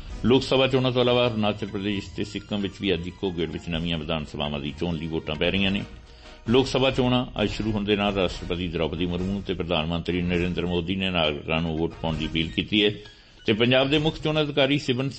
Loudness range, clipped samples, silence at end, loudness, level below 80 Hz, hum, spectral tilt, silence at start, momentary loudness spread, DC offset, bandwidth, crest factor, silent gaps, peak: 4 LU; under 0.1%; 0 s; -25 LUFS; -42 dBFS; none; -6 dB/octave; 0 s; 9 LU; under 0.1%; 8.8 kHz; 18 dB; none; -8 dBFS